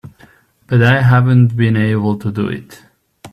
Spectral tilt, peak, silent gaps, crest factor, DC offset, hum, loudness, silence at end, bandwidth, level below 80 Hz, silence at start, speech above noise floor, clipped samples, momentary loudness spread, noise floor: -8.5 dB/octave; 0 dBFS; none; 14 dB; under 0.1%; none; -13 LUFS; 0.05 s; 6.2 kHz; -48 dBFS; 0.7 s; 35 dB; under 0.1%; 11 LU; -47 dBFS